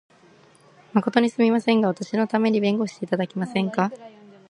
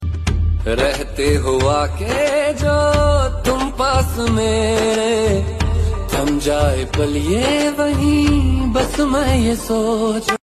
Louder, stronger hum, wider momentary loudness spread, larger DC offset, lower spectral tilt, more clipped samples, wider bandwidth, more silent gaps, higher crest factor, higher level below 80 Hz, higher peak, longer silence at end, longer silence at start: second, -23 LUFS vs -17 LUFS; neither; first, 7 LU vs 4 LU; neither; about the same, -6.5 dB/octave vs -5.5 dB/octave; neither; second, 10.5 kHz vs 14.5 kHz; neither; first, 20 dB vs 14 dB; second, -72 dBFS vs -24 dBFS; about the same, -2 dBFS vs -2 dBFS; first, 0.4 s vs 0.05 s; first, 0.95 s vs 0 s